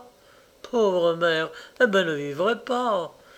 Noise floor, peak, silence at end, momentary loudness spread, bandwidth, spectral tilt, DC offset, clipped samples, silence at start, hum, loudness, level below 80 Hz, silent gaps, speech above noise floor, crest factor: -55 dBFS; -6 dBFS; 0.25 s; 7 LU; 14 kHz; -5 dB/octave; under 0.1%; under 0.1%; 0 s; none; -24 LUFS; -68 dBFS; none; 31 dB; 18 dB